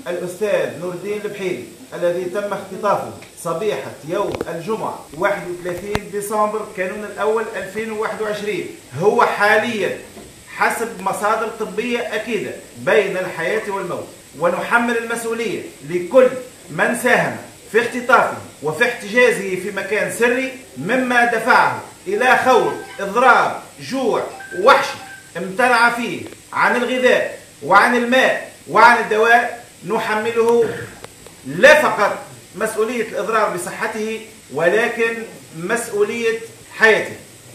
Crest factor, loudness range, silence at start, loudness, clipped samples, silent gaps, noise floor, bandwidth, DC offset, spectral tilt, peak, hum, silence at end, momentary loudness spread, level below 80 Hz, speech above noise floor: 18 dB; 8 LU; 0 s; -18 LUFS; under 0.1%; none; -39 dBFS; 15 kHz; under 0.1%; -4 dB/octave; 0 dBFS; none; 0 s; 16 LU; -56 dBFS; 21 dB